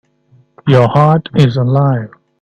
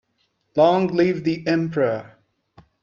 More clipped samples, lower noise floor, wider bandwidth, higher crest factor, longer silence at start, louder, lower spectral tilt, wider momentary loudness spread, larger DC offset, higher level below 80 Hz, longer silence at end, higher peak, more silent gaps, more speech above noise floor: neither; second, -50 dBFS vs -69 dBFS; about the same, 7.4 kHz vs 7.2 kHz; second, 12 dB vs 18 dB; about the same, 0.65 s vs 0.55 s; first, -12 LUFS vs -21 LUFS; about the same, -8.5 dB/octave vs -7.5 dB/octave; first, 11 LU vs 8 LU; neither; first, -46 dBFS vs -62 dBFS; second, 0.35 s vs 0.75 s; first, 0 dBFS vs -4 dBFS; neither; second, 40 dB vs 50 dB